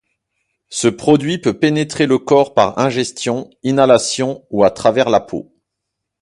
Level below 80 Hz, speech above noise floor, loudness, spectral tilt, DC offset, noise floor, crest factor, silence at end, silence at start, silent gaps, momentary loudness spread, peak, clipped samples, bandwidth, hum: -54 dBFS; 63 dB; -15 LUFS; -5 dB/octave; under 0.1%; -78 dBFS; 16 dB; 0.8 s; 0.7 s; none; 9 LU; 0 dBFS; under 0.1%; 11.5 kHz; none